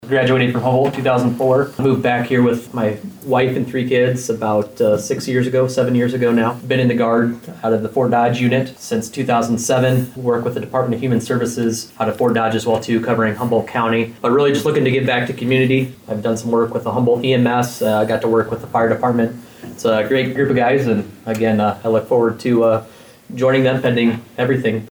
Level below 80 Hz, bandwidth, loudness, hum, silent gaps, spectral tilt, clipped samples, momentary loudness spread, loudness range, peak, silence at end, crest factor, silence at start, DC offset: -56 dBFS; over 20 kHz; -17 LUFS; none; none; -6 dB/octave; under 0.1%; 6 LU; 2 LU; -6 dBFS; 0 s; 10 dB; 0 s; under 0.1%